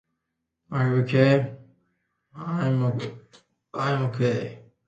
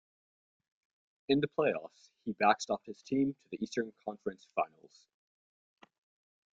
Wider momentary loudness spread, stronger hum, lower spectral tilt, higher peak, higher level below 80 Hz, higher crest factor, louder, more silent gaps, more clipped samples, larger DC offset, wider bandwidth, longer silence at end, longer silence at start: first, 17 LU vs 13 LU; neither; first, -8 dB/octave vs -5 dB/octave; first, -6 dBFS vs -14 dBFS; first, -62 dBFS vs -76 dBFS; about the same, 20 dB vs 24 dB; first, -24 LUFS vs -34 LUFS; neither; neither; neither; about the same, 7.8 kHz vs 7.8 kHz; second, 0.3 s vs 1.9 s; second, 0.7 s vs 1.3 s